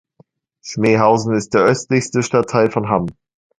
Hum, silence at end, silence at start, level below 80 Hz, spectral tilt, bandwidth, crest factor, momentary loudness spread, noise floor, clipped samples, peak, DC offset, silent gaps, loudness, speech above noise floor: none; 0.45 s; 0.65 s; -52 dBFS; -6 dB/octave; 10.5 kHz; 16 dB; 9 LU; -55 dBFS; under 0.1%; 0 dBFS; under 0.1%; none; -16 LUFS; 39 dB